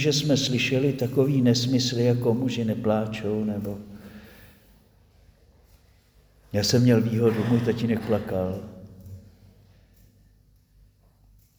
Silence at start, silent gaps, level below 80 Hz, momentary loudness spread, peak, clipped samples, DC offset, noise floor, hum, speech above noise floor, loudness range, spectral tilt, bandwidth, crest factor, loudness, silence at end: 0 s; none; -56 dBFS; 22 LU; -8 dBFS; under 0.1%; under 0.1%; -59 dBFS; 50 Hz at -55 dBFS; 36 dB; 12 LU; -5.5 dB/octave; over 20 kHz; 18 dB; -24 LUFS; 2.4 s